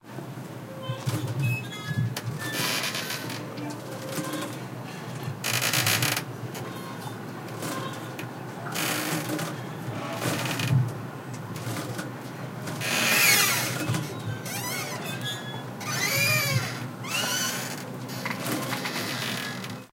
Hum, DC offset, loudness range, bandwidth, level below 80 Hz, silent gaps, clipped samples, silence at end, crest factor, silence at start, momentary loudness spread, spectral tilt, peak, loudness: none; under 0.1%; 7 LU; 17 kHz; -66 dBFS; none; under 0.1%; 0.05 s; 22 dB; 0.05 s; 14 LU; -3 dB/octave; -8 dBFS; -28 LUFS